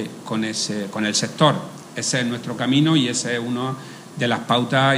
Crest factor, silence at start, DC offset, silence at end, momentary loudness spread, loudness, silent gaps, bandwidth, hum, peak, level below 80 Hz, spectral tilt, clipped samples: 20 dB; 0 s; under 0.1%; 0 s; 10 LU; -21 LUFS; none; 15.5 kHz; none; -2 dBFS; -68 dBFS; -4 dB/octave; under 0.1%